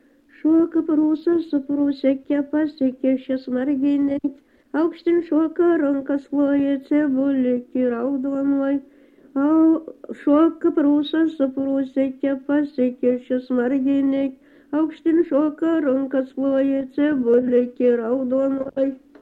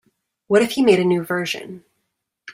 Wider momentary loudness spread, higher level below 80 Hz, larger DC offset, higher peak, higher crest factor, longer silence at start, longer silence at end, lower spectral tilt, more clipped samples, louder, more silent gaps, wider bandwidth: second, 6 LU vs 12 LU; about the same, -62 dBFS vs -64 dBFS; neither; second, -8 dBFS vs -2 dBFS; about the same, 14 dB vs 18 dB; about the same, 0.45 s vs 0.5 s; first, 0.25 s vs 0 s; first, -8 dB/octave vs -5.5 dB/octave; neither; second, -21 LUFS vs -18 LUFS; neither; second, 4.7 kHz vs 16 kHz